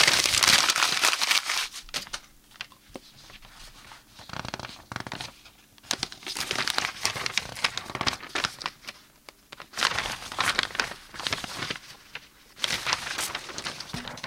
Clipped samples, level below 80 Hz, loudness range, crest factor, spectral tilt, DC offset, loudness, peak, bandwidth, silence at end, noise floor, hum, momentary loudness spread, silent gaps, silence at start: under 0.1%; -56 dBFS; 13 LU; 26 dB; 0 dB/octave; under 0.1%; -26 LUFS; -4 dBFS; 17 kHz; 0 s; -54 dBFS; none; 25 LU; none; 0 s